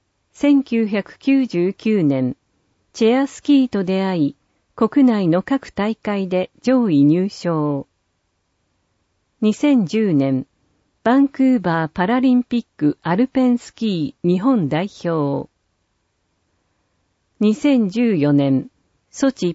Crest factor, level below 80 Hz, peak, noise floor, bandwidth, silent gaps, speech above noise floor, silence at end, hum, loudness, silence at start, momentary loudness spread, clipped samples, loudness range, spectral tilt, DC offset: 14 dB; -60 dBFS; -4 dBFS; -69 dBFS; 8 kHz; none; 52 dB; 0 s; none; -18 LUFS; 0.4 s; 8 LU; under 0.1%; 4 LU; -7 dB/octave; under 0.1%